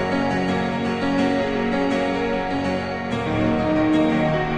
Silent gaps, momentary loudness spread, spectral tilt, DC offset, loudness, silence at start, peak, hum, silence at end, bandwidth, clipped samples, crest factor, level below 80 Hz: none; 5 LU; -7 dB/octave; under 0.1%; -21 LUFS; 0 s; -10 dBFS; none; 0 s; 9.2 kHz; under 0.1%; 12 dB; -42 dBFS